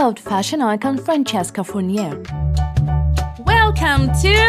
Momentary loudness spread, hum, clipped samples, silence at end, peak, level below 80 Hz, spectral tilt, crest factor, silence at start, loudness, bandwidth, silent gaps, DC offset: 8 LU; none; under 0.1%; 0 s; -4 dBFS; -24 dBFS; -5.5 dB/octave; 12 dB; 0 s; -18 LUFS; 14.5 kHz; none; under 0.1%